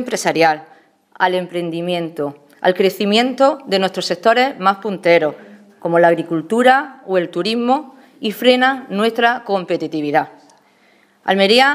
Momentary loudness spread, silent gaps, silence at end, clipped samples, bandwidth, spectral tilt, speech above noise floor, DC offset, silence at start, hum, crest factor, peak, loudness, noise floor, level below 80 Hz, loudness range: 10 LU; none; 0 s; under 0.1%; 15.5 kHz; -4.5 dB/octave; 38 dB; under 0.1%; 0 s; none; 16 dB; 0 dBFS; -16 LUFS; -54 dBFS; -72 dBFS; 2 LU